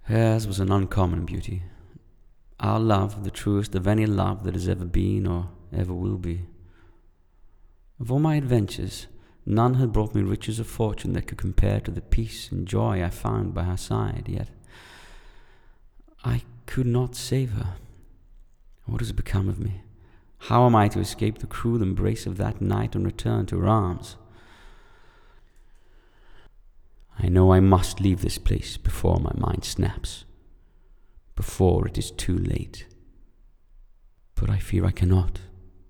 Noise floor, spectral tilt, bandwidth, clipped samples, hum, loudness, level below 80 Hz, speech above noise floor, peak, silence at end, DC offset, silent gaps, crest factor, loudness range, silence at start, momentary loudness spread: -56 dBFS; -7 dB/octave; 14.5 kHz; under 0.1%; none; -25 LUFS; -36 dBFS; 32 dB; -2 dBFS; 0.2 s; under 0.1%; none; 22 dB; 7 LU; 0.05 s; 13 LU